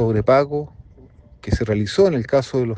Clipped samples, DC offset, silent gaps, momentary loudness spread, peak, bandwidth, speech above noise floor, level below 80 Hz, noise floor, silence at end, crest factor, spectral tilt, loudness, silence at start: under 0.1%; under 0.1%; none; 12 LU; -4 dBFS; 9.2 kHz; 28 dB; -38 dBFS; -47 dBFS; 0 s; 16 dB; -7 dB/octave; -19 LUFS; 0 s